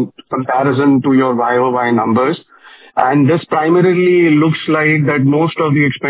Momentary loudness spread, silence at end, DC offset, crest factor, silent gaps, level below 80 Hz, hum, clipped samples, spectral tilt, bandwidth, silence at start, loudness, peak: 6 LU; 0 s; under 0.1%; 12 dB; none; -58 dBFS; none; under 0.1%; -11 dB/octave; 4 kHz; 0 s; -13 LUFS; 0 dBFS